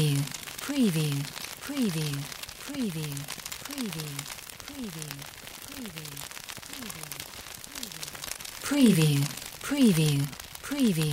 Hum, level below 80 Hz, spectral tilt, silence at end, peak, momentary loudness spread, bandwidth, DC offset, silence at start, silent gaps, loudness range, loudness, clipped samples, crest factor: none; -58 dBFS; -5 dB/octave; 0 s; -8 dBFS; 16 LU; 16 kHz; under 0.1%; 0 s; none; 12 LU; -30 LUFS; under 0.1%; 20 dB